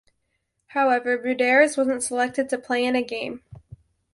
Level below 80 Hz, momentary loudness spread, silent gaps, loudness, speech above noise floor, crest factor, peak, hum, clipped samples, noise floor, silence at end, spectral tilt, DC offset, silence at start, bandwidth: -62 dBFS; 13 LU; none; -22 LUFS; 53 dB; 20 dB; -4 dBFS; none; under 0.1%; -75 dBFS; 0.6 s; -3 dB/octave; under 0.1%; 0.75 s; 11.5 kHz